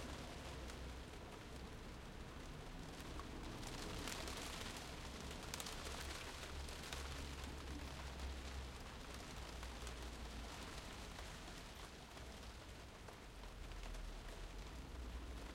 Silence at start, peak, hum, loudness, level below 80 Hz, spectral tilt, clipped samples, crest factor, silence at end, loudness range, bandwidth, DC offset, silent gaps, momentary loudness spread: 0 s; -28 dBFS; none; -51 LUFS; -54 dBFS; -3.5 dB/octave; under 0.1%; 24 dB; 0 s; 6 LU; 16.5 kHz; under 0.1%; none; 7 LU